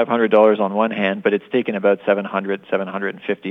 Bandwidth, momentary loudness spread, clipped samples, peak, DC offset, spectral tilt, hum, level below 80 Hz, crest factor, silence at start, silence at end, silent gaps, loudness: 3.9 kHz; 10 LU; under 0.1%; -2 dBFS; under 0.1%; -8.5 dB/octave; none; -78 dBFS; 16 dB; 0 s; 0 s; none; -19 LUFS